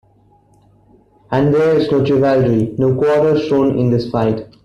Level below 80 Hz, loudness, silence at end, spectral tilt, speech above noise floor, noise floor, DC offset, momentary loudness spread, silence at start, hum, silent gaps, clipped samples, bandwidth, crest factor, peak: -46 dBFS; -15 LUFS; 0.2 s; -8.5 dB/octave; 38 dB; -52 dBFS; under 0.1%; 4 LU; 1.3 s; 50 Hz at -40 dBFS; none; under 0.1%; 9.4 kHz; 12 dB; -2 dBFS